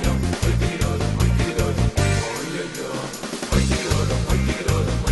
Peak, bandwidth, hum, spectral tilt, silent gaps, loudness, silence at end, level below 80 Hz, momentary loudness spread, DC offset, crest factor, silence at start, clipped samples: -4 dBFS; 12 kHz; none; -5 dB/octave; none; -22 LUFS; 0 s; -26 dBFS; 8 LU; under 0.1%; 16 dB; 0 s; under 0.1%